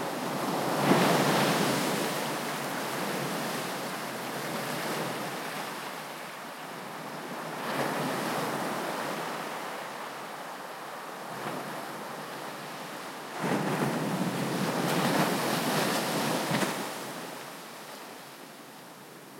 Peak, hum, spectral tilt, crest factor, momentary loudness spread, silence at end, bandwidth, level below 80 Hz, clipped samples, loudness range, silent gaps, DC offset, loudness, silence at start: -8 dBFS; none; -4 dB/octave; 24 dB; 13 LU; 0 s; 16.5 kHz; -78 dBFS; under 0.1%; 9 LU; none; under 0.1%; -31 LUFS; 0 s